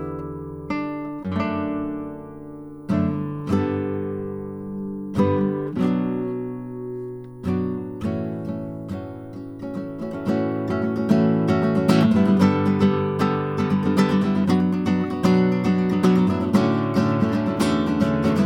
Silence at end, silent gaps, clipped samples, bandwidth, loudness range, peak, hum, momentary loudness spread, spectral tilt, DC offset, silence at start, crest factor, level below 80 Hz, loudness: 0 s; none; under 0.1%; 12.5 kHz; 9 LU; -4 dBFS; none; 14 LU; -8 dB/octave; under 0.1%; 0 s; 16 dB; -52 dBFS; -22 LUFS